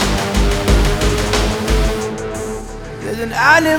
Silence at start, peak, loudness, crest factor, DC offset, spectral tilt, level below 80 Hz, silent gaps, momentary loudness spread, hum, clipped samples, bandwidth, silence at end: 0 s; 0 dBFS; -16 LUFS; 16 dB; under 0.1%; -4.5 dB/octave; -20 dBFS; none; 12 LU; none; under 0.1%; 18.5 kHz; 0 s